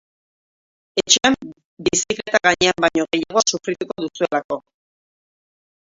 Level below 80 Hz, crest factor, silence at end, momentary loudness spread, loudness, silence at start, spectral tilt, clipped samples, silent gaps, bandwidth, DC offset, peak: -54 dBFS; 22 dB; 1.35 s; 12 LU; -19 LUFS; 0.95 s; -2 dB/octave; under 0.1%; 1.64-1.77 s, 4.44-4.49 s; 8 kHz; under 0.1%; 0 dBFS